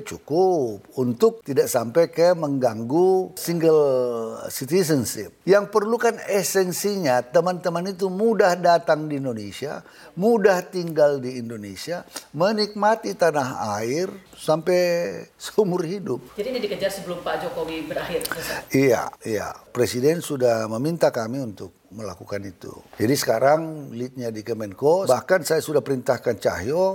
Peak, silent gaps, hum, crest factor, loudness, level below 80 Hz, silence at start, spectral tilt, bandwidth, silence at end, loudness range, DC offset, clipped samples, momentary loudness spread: -4 dBFS; none; none; 18 dB; -22 LUFS; -60 dBFS; 0 s; -5 dB/octave; 17 kHz; 0 s; 4 LU; under 0.1%; under 0.1%; 13 LU